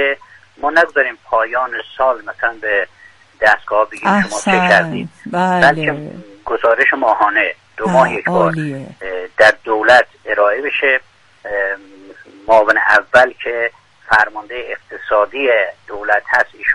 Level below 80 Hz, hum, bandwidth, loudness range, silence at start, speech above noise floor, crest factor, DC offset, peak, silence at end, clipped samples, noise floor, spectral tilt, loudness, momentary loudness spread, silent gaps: -52 dBFS; none; 11.5 kHz; 3 LU; 0 s; 25 dB; 16 dB; under 0.1%; 0 dBFS; 0 s; under 0.1%; -39 dBFS; -4.5 dB/octave; -14 LUFS; 14 LU; none